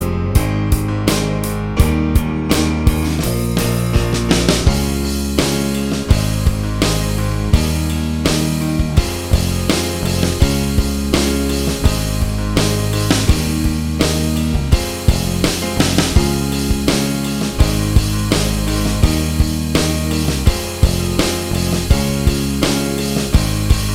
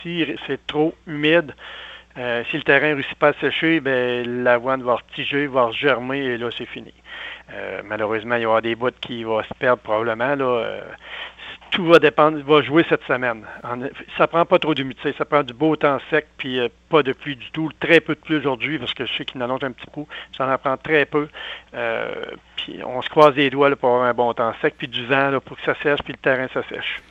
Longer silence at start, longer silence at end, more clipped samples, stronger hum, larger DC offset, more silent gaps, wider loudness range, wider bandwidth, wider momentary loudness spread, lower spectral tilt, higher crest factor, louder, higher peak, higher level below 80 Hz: about the same, 0 s vs 0 s; about the same, 0 s vs 0.1 s; neither; neither; neither; neither; second, 1 LU vs 5 LU; first, 16.5 kHz vs 8.2 kHz; second, 3 LU vs 15 LU; second, -5 dB/octave vs -6.5 dB/octave; about the same, 16 dB vs 20 dB; first, -17 LUFS vs -20 LUFS; about the same, 0 dBFS vs 0 dBFS; first, -20 dBFS vs -56 dBFS